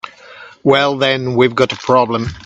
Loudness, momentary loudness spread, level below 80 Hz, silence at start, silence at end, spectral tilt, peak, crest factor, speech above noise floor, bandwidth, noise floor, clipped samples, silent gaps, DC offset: -14 LUFS; 6 LU; -48 dBFS; 0.05 s; 0.05 s; -5.5 dB/octave; 0 dBFS; 16 dB; 25 dB; 8.4 kHz; -38 dBFS; under 0.1%; none; under 0.1%